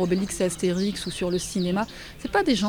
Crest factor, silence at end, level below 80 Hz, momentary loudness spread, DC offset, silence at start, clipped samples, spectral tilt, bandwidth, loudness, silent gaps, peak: 16 dB; 0 s; -46 dBFS; 4 LU; under 0.1%; 0 s; under 0.1%; -5 dB/octave; 19 kHz; -26 LUFS; none; -8 dBFS